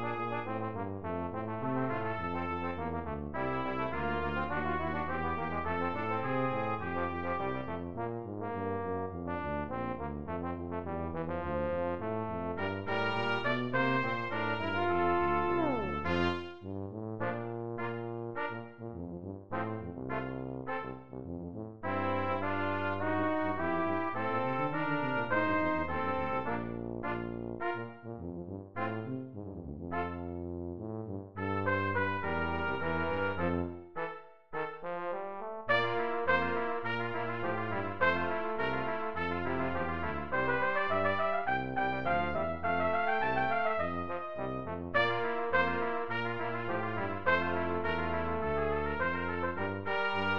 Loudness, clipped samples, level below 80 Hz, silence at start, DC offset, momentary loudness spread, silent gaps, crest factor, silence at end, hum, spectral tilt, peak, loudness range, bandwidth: -34 LUFS; under 0.1%; -54 dBFS; 0 s; 0.6%; 10 LU; none; 18 dB; 0 s; none; -8 dB/octave; -16 dBFS; 7 LU; 7 kHz